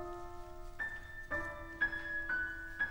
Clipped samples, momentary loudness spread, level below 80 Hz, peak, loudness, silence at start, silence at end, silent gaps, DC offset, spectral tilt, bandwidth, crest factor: under 0.1%; 13 LU; -52 dBFS; -24 dBFS; -39 LUFS; 0 s; 0 s; none; under 0.1%; -5 dB/octave; over 20 kHz; 16 dB